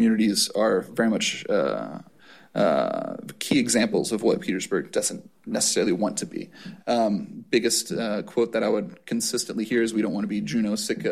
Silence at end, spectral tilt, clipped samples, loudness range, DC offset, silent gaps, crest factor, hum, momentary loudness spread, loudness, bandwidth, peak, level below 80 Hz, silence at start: 0 s; -3.5 dB/octave; under 0.1%; 1 LU; 0.1%; none; 16 dB; none; 10 LU; -24 LUFS; 15.5 kHz; -8 dBFS; -64 dBFS; 0 s